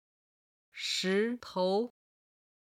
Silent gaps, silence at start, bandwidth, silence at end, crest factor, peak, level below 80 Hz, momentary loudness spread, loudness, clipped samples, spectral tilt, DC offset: none; 0.75 s; 16 kHz; 0.75 s; 16 dB; -20 dBFS; -80 dBFS; 10 LU; -32 LUFS; under 0.1%; -4 dB/octave; under 0.1%